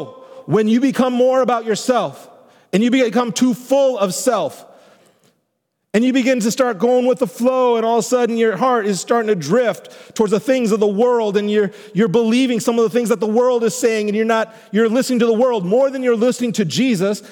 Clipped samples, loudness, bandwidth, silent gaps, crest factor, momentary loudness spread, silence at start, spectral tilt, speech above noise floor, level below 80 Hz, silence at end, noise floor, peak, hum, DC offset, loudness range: under 0.1%; -17 LUFS; 18.5 kHz; none; 14 dB; 5 LU; 0 s; -5 dB/octave; 56 dB; -70 dBFS; 0 s; -72 dBFS; -2 dBFS; none; under 0.1%; 2 LU